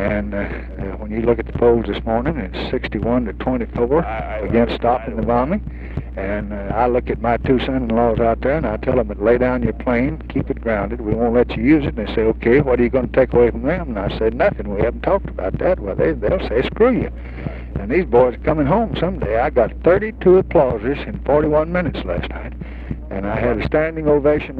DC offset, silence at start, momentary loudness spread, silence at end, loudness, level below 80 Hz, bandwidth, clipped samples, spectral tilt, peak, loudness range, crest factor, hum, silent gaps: under 0.1%; 0 s; 9 LU; 0 s; -18 LUFS; -30 dBFS; 5 kHz; under 0.1%; -10 dB/octave; 0 dBFS; 3 LU; 16 dB; none; none